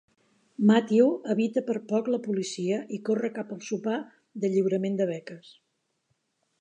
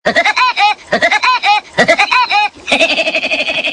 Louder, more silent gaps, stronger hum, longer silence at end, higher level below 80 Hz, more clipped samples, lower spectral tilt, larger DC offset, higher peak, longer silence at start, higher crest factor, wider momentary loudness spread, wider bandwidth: second, -27 LUFS vs -11 LUFS; neither; neither; first, 1.2 s vs 0 s; second, -82 dBFS vs -50 dBFS; neither; first, -6.5 dB/octave vs -2 dB/octave; neither; second, -8 dBFS vs 0 dBFS; first, 0.6 s vs 0.05 s; first, 20 dB vs 12 dB; first, 14 LU vs 4 LU; second, 9.2 kHz vs 10.5 kHz